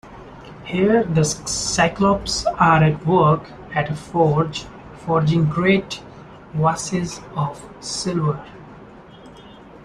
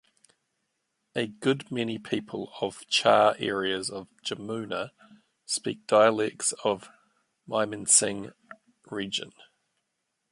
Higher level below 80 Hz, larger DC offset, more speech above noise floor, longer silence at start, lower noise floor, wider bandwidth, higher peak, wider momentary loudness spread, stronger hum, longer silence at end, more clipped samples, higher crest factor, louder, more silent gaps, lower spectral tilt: first, -44 dBFS vs -70 dBFS; neither; second, 23 dB vs 53 dB; second, 0.05 s vs 1.15 s; second, -42 dBFS vs -80 dBFS; about the same, 12 kHz vs 11.5 kHz; first, -2 dBFS vs -6 dBFS; about the same, 16 LU vs 16 LU; neither; second, 0.05 s vs 1 s; neither; about the same, 18 dB vs 22 dB; first, -19 LUFS vs -27 LUFS; neither; first, -5 dB/octave vs -2.5 dB/octave